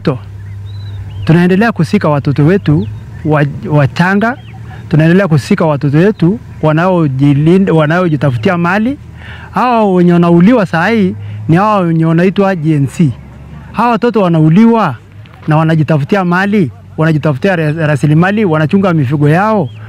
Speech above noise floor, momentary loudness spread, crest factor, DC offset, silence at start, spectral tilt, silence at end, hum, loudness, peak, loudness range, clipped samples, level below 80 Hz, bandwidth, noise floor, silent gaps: 20 dB; 13 LU; 10 dB; under 0.1%; 0 s; -8.5 dB/octave; 0 s; none; -10 LUFS; 0 dBFS; 2 LU; under 0.1%; -40 dBFS; 11 kHz; -29 dBFS; none